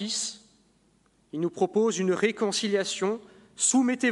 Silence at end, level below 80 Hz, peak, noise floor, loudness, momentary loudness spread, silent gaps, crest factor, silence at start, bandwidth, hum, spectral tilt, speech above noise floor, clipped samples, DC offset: 0 s; -74 dBFS; -10 dBFS; -65 dBFS; -26 LUFS; 9 LU; none; 16 dB; 0 s; 11.5 kHz; none; -3 dB/octave; 39 dB; under 0.1%; under 0.1%